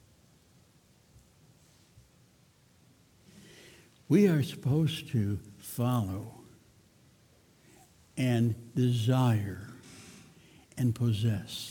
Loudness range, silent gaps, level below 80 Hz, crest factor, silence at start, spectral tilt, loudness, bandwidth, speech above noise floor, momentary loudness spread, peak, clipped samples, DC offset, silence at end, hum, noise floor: 5 LU; none; -64 dBFS; 20 dB; 4.1 s; -7 dB/octave; -30 LUFS; 18 kHz; 35 dB; 22 LU; -12 dBFS; under 0.1%; under 0.1%; 0 s; none; -63 dBFS